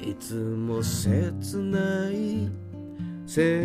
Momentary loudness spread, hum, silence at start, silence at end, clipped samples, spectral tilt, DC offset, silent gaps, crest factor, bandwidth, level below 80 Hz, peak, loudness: 12 LU; none; 0 s; 0 s; under 0.1%; -6 dB/octave; under 0.1%; none; 16 dB; 15.5 kHz; -54 dBFS; -10 dBFS; -28 LUFS